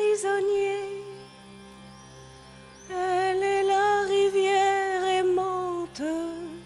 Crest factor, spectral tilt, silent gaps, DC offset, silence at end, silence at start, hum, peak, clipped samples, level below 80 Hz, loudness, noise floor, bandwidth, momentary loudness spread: 14 dB; -3.5 dB/octave; none; under 0.1%; 0 s; 0 s; none; -12 dBFS; under 0.1%; -60 dBFS; -25 LUFS; -48 dBFS; 11.5 kHz; 16 LU